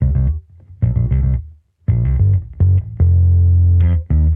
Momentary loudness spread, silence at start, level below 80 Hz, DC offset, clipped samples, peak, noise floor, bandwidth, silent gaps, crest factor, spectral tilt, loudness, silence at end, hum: 9 LU; 0 s; -20 dBFS; under 0.1%; under 0.1%; -4 dBFS; -34 dBFS; 2.2 kHz; none; 10 dB; -13 dB/octave; -16 LUFS; 0 s; none